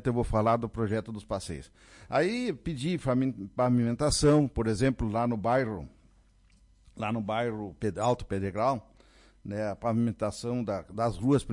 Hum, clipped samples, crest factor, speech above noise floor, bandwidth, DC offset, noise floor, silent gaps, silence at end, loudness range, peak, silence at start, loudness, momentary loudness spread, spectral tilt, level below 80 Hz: none; under 0.1%; 16 dB; 33 dB; 11.5 kHz; under 0.1%; -61 dBFS; none; 0 s; 5 LU; -14 dBFS; 0 s; -29 LUFS; 10 LU; -6 dB/octave; -48 dBFS